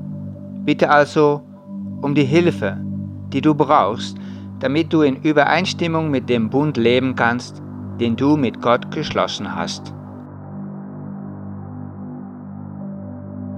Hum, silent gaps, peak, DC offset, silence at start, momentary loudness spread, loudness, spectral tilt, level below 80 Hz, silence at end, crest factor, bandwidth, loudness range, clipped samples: 50 Hz at -45 dBFS; none; 0 dBFS; under 0.1%; 0 s; 18 LU; -18 LUFS; -6.5 dB/octave; -62 dBFS; 0 s; 18 dB; 9.8 kHz; 13 LU; under 0.1%